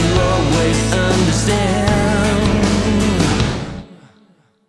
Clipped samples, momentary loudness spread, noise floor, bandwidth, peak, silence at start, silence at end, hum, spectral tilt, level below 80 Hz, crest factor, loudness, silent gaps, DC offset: under 0.1%; 4 LU; -53 dBFS; 12 kHz; -2 dBFS; 0 s; 0.75 s; none; -5 dB/octave; -26 dBFS; 12 dB; -15 LUFS; none; under 0.1%